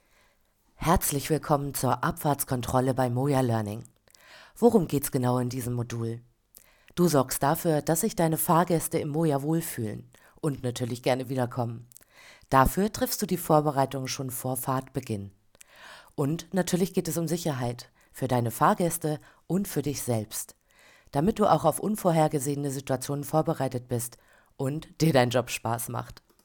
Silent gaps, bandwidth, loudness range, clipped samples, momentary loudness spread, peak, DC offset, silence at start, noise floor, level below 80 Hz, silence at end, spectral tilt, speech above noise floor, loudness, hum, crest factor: none; 19 kHz; 4 LU; under 0.1%; 12 LU; -6 dBFS; under 0.1%; 0.8 s; -66 dBFS; -48 dBFS; 0.3 s; -5.5 dB/octave; 40 dB; -27 LUFS; none; 22 dB